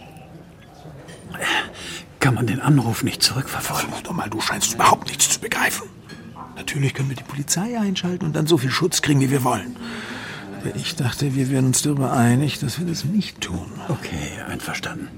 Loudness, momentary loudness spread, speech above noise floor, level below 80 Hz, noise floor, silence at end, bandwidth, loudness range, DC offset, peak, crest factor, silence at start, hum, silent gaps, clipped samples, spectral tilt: -21 LUFS; 14 LU; 22 dB; -50 dBFS; -43 dBFS; 0 s; 16.5 kHz; 3 LU; under 0.1%; -2 dBFS; 20 dB; 0 s; none; none; under 0.1%; -4 dB/octave